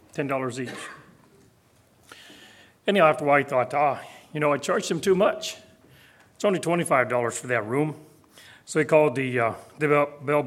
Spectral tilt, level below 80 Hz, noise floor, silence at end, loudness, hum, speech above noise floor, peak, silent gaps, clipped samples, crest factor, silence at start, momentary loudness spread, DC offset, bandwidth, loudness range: -5 dB/octave; -70 dBFS; -60 dBFS; 0 s; -24 LUFS; none; 36 dB; -4 dBFS; none; under 0.1%; 20 dB; 0.15 s; 14 LU; under 0.1%; 15.5 kHz; 4 LU